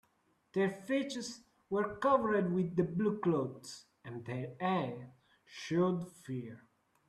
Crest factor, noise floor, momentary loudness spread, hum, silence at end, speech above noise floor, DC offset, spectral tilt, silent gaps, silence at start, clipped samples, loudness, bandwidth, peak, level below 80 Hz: 20 dB; -75 dBFS; 18 LU; none; 0.5 s; 40 dB; under 0.1%; -6.5 dB/octave; none; 0.55 s; under 0.1%; -35 LUFS; 12.5 kHz; -16 dBFS; -72 dBFS